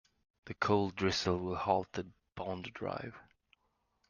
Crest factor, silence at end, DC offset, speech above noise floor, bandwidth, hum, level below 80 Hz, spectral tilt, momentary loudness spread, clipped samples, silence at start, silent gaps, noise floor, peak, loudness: 22 dB; 0.9 s; under 0.1%; 44 dB; 9.6 kHz; none; -66 dBFS; -5 dB/octave; 14 LU; under 0.1%; 0.45 s; none; -79 dBFS; -14 dBFS; -35 LUFS